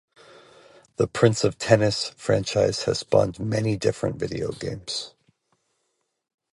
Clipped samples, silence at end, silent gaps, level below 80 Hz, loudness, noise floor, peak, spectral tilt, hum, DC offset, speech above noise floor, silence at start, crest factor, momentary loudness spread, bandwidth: under 0.1%; 1.45 s; none; -52 dBFS; -24 LUFS; -75 dBFS; 0 dBFS; -5 dB/octave; none; under 0.1%; 52 dB; 1 s; 24 dB; 10 LU; 11.5 kHz